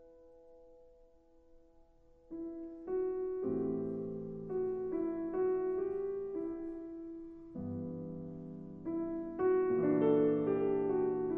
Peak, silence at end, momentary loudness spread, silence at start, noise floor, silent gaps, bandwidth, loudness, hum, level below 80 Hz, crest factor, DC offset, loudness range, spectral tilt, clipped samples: -18 dBFS; 0 s; 15 LU; 0 s; -63 dBFS; none; 3.3 kHz; -36 LUFS; none; -64 dBFS; 18 dB; under 0.1%; 9 LU; -11 dB/octave; under 0.1%